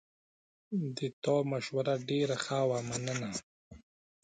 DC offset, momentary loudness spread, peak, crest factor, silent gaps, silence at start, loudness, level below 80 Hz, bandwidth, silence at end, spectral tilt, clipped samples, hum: under 0.1%; 6 LU; -18 dBFS; 16 dB; 1.13-1.22 s, 3.43-3.71 s; 0.7 s; -34 LUFS; -68 dBFS; 9.6 kHz; 0.45 s; -5 dB/octave; under 0.1%; none